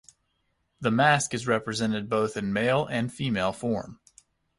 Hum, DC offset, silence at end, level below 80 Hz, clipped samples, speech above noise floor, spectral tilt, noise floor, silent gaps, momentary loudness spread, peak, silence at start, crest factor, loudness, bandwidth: none; under 0.1%; 0.65 s; -58 dBFS; under 0.1%; 48 dB; -5 dB/octave; -74 dBFS; none; 9 LU; -8 dBFS; 0.8 s; 20 dB; -26 LUFS; 11.5 kHz